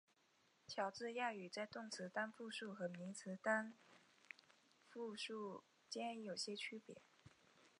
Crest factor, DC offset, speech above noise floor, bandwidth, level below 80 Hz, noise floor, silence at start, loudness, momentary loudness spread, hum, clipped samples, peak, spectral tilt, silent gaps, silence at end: 24 dB; under 0.1%; 30 dB; 10.5 kHz; under -90 dBFS; -78 dBFS; 0.7 s; -48 LUFS; 17 LU; none; under 0.1%; -26 dBFS; -3.5 dB/octave; none; 0.1 s